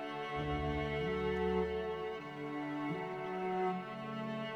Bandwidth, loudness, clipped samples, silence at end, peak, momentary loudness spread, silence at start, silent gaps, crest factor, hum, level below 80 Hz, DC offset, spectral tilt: 10 kHz; -38 LUFS; under 0.1%; 0 s; -24 dBFS; 7 LU; 0 s; none; 14 dB; none; -52 dBFS; under 0.1%; -7.5 dB/octave